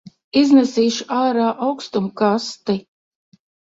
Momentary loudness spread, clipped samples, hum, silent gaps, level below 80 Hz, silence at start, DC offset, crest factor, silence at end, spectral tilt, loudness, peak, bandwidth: 10 LU; under 0.1%; none; none; -62 dBFS; 0.35 s; under 0.1%; 16 dB; 0.95 s; -5 dB/octave; -18 LUFS; -2 dBFS; 7.8 kHz